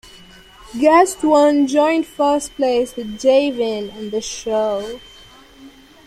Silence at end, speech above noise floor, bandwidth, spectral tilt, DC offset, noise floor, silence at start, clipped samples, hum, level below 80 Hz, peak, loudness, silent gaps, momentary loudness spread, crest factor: 0.35 s; 27 dB; 14.5 kHz; -3.5 dB/octave; under 0.1%; -44 dBFS; 0.15 s; under 0.1%; none; -50 dBFS; -2 dBFS; -17 LUFS; none; 12 LU; 16 dB